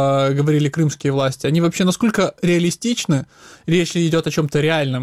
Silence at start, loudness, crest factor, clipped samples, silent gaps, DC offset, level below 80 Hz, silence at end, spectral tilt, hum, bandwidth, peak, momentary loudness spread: 0 s; -18 LUFS; 16 dB; under 0.1%; none; under 0.1%; -52 dBFS; 0 s; -5.5 dB/octave; none; 15 kHz; -2 dBFS; 4 LU